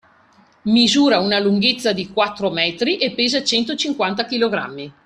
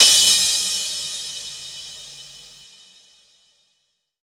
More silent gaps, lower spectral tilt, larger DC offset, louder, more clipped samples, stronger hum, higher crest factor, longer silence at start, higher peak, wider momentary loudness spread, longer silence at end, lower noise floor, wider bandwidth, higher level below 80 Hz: neither; first, -4 dB/octave vs 2.5 dB/octave; neither; about the same, -17 LUFS vs -17 LUFS; neither; neither; second, 16 dB vs 22 dB; first, 0.65 s vs 0 s; about the same, -2 dBFS vs 0 dBFS; second, 6 LU vs 25 LU; second, 0.15 s vs 1.8 s; second, -53 dBFS vs -71 dBFS; second, 12.5 kHz vs over 20 kHz; about the same, -58 dBFS vs -60 dBFS